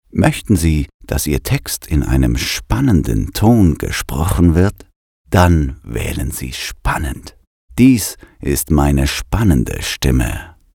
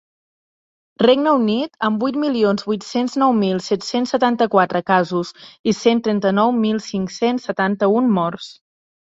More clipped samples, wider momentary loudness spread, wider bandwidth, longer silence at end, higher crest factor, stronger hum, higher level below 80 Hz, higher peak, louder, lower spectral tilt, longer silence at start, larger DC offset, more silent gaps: neither; first, 10 LU vs 7 LU; first, 18.5 kHz vs 8 kHz; second, 0.25 s vs 0.7 s; about the same, 14 dB vs 16 dB; neither; first, -24 dBFS vs -62 dBFS; about the same, 0 dBFS vs -2 dBFS; about the same, -16 LUFS vs -18 LUFS; about the same, -5.5 dB/octave vs -6 dB/octave; second, 0.15 s vs 1 s; neither; first, 0.94-1.00 s, 4.96-5.25 s, 7.47-7.68 s vs 5.59-5.64 s